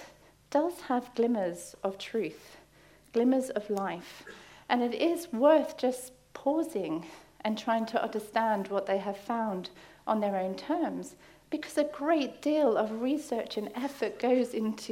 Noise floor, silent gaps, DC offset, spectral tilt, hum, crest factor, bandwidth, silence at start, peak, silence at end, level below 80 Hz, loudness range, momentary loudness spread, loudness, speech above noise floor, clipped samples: -59 dBFS; none; under 0.1%; -5 dB/octave; none; 20 dB; 16 kHz; 0 s; -12 dBFS; 0 s; -70 dBFS; 4 LU; 12 LU; -31 LUFS; 29 dB; under 0.1%